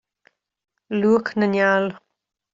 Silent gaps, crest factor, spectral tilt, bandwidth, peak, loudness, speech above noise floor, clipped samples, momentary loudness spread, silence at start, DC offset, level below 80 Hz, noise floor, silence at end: none; 18 dB; -7 dB/octave; 7.6 kHz; -6 dBFS; -20 LUFS; 59 dB; under 0.1%; 9 LU; 0.9 s; under 0.1%; -66 dBFS; -79 dBFS; 0.55 s